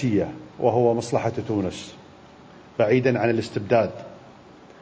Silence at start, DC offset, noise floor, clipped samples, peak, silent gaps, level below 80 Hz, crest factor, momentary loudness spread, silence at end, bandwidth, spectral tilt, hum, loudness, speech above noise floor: 0 s; under 0.1%; -47 dBFS; under 0.1%; -6 dBFS; none; -54 dBFS; 18 dB; 16 LU; 0.5 s; 8 kHz; -7 dB/octave; none; -23 LUFS; 25 dB